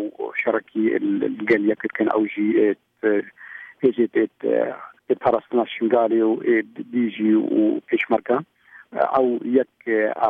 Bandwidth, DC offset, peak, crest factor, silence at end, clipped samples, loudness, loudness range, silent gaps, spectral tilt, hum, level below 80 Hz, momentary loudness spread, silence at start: 4.6 kHz; under 0.1%; -6 dBFS; 16 dB; 0 s; under 0.1%; -21 LUFS; 2 LU; none; -8.5 dB/octave; none; -68 dBFS; 6 LU; 0 s